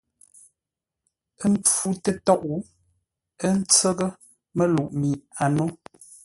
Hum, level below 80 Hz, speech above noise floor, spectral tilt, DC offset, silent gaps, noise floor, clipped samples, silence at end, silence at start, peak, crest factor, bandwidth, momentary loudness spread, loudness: none; -58 dBFS; 65 dB; -4.5 dB/octave; under 0.1%; none; -87 dBFS; under 0.1%; 0.5 s; 1.4 s; -4 dBFS; 20 dB; 12 kHz; 12 LU; -23 LUFS